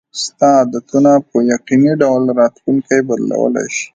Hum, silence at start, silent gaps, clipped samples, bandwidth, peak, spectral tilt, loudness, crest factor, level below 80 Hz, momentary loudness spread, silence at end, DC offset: none; 0.15 s; none; under 0.1%; 9.2 kHz; 0 dBFS; -5.5 dB/octave; -13 LUFS; 12 dB; -60 dBFS; 6 LU; 0.1 s; under 0.1%